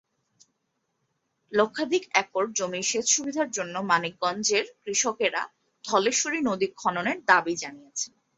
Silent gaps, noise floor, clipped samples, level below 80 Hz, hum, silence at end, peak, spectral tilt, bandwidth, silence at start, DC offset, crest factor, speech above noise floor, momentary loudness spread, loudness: none; -77 dBFS; under 0.1%; -72 dBFS; none; 0.3 s; -4 dBFS; -2 dB/octave; 8.4 kHz; 1.5 s; under 0.1%; 24 dB; 51 dB; 11 LU; -26 LUFS